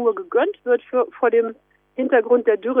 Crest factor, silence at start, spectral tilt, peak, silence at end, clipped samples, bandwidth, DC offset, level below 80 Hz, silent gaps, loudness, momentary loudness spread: 14 dB; 0 s; -8 dB/octave; -6 dBFS; 0 s; under 0.1%; 3.7 kHz; under 0.1%; -70 dBFS; none; -20 LUFS; 9 LU